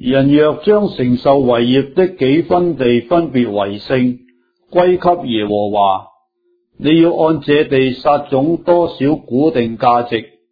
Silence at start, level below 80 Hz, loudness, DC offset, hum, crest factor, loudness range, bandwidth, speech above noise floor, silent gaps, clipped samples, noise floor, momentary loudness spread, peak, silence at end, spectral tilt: 0 s; -46 dBFS; -14 LUFS; under 0.1%; none; 14 dB; 3 LU; 5 kHz; 49 dB; none; under 0.1%; -62 dBFS; 5 LU; 0 dBFS; 0.25 s; -9.5 dB/octave